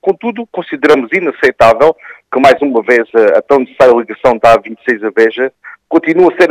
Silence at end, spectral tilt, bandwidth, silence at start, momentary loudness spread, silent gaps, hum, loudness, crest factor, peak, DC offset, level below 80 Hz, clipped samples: 0 s; -5.5 dB/octave; 13 kHz; 0.05 s; 10 LU; none; none; -10 LUFS; 10 dB; 0 dBFS; under 0.1%; -44 dBFS; 1%